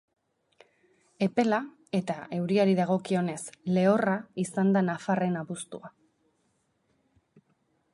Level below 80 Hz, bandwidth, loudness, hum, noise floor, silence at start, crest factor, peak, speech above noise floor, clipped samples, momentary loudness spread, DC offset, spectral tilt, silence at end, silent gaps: -74 dBFS; 11.5 kHz; -28 LUFS; none; -73 dBFS; 1.2 s; 20 dB; -10 dBFS; 46 dB; under 0.1%; 10 LU; under 0.1%; -6.5 dB/octave; 2.05 s; none